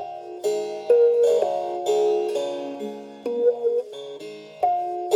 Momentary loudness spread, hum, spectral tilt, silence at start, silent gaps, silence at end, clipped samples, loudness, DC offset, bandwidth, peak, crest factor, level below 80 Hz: 17 LU; none; -4 dB/octave; 0 s; none; 0 s; under 0.1%; -23 LUFS; under 0.1%; 12.5 kHz; -8 dBFS; 16 dB; -80 dBFS